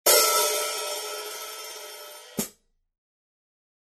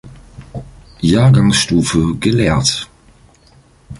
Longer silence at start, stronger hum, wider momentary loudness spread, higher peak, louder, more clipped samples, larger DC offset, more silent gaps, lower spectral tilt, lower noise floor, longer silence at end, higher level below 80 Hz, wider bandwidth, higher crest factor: about the same, 0.05 s vs 0.05 s; neither; about the same, 20 LU vs 22 LU; second, -4 dBFS vs 0 dBFS; second, -25 LUFS vs -13 LUFS; neither; neither; neither; second, 0 dB/octave vs -5 dB/octave; first, -52 dBFS vs -48 dBFS; first, 1.35 s vs 0.05 s; second, -72 dBFS vs -34 dBFS; first, 14 kHz vs 11.5 kHz; first, 24 dB vs 14 dB